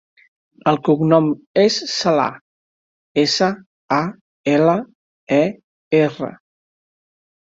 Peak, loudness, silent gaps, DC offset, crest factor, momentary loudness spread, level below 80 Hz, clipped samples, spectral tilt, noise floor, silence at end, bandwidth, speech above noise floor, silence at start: -2 dBFS; -18 LUFS; 1.47-1.54 s, 2.41-3.15 s, 3.66-3.89 s, 4.21-4.44 s, 4.95-5.27 s, 5.64-5.91 s; under 0.1%; 18 dB; 10 LU; -62 dBFS; under 0.1%; -5.5 dB/octave; under -90 dBFS; 1.2 s; 7.8 kHz; over 73 dB; 0.65 s